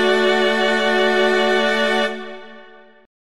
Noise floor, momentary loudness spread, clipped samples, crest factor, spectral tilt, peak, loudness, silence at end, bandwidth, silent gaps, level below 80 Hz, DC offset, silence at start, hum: -44 dBFS; 13 LU; under 0.1%; 14 dB; -3.5 dB/octave; -4 dBFS; -17 LUFS; 0.3 s; 13 kHz; none; -64 dBFS; 2%; 0 s; none